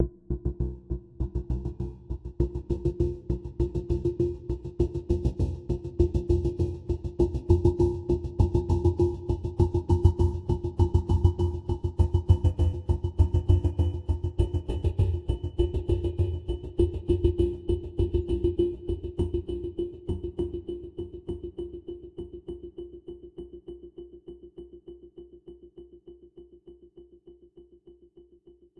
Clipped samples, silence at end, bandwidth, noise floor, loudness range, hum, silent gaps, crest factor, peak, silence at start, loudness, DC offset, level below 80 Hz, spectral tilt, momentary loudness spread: under 0.1%; 0.9 s; 6.8 kHz; -57 dBFS; 17 LU; none; none; 20 dB; -6 dBFS; 0 s; -28 LUFS; under 0.1%; -34 dBFS; -10 dB/octave; 19 LU